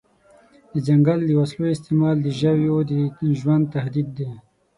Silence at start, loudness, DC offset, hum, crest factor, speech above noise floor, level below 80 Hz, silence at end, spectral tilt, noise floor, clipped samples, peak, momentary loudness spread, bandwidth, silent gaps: 0.75 s; -21 LUFS; under 0.1%; none; 14 dB; 34 dB; -56 dBFS; 0.35 s; -9 dB/octave; -54 dBFS; under 0.1%; -6 dBFS; 10 LU; 11 kHz; none